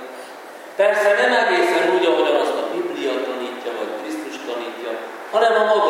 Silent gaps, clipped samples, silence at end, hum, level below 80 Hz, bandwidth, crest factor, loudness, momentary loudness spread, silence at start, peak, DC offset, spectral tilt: none; under 0.1%; 0 s; none; -88 dBFS; 16.5 kHz; 16 dB; -19 LUFS; 14 LU; 0 s; -4 dBFS; under 0.1%; -3 dB/octave